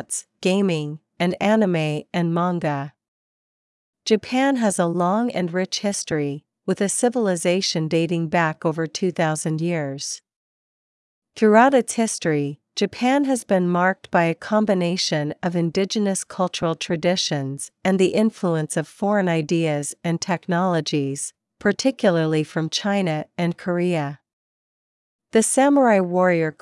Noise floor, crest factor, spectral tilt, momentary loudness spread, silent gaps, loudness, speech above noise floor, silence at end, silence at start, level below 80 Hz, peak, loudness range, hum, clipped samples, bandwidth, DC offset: under -90 dBFS; 20 dB; -5 dB/octave; 8 LU; 3.08-3.93 s, 10.36-11.22 s, 24.33-25.19 s; -21 LUFS; over 69 dB; 0.1 s; 0 s; -68 dBFS; -2 dBFS; 3 LU; none; under 0.1%; 12 kHz; under 0.1%